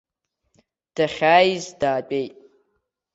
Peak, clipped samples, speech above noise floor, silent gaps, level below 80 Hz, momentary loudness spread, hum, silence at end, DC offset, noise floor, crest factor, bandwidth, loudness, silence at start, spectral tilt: -2 dBFS; under 0.1%; 54 dB; none; -62 dBFS; 15 LU; none; 0.85 s; under 0.1%; -74 dBFS; 22 dB; 8 kHz; -20 LUFS; 0.95 s; -4.5 dB/octave